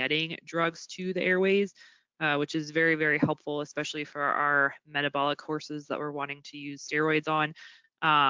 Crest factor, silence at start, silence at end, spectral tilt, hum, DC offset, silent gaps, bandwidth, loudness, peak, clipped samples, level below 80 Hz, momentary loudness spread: 18 dB; 0 s; 0 s; -5 dB/octave; none; under 0.1%; none; 7.6 kHz; -29 LUFS; -12 dBFS; under 0.1%; -74 dBFS; 11 LU